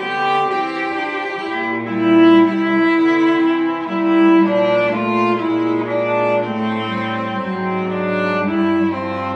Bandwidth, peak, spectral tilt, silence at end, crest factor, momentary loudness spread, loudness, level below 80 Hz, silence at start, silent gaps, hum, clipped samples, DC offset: 6.2 kHz; -2 dBFS; -7.5 dB/octave; 0 s; 14 dB; 9 LU; -17 LUFS; -62 dBFS; 0 s; none; none; under 0.1%; under 0.1%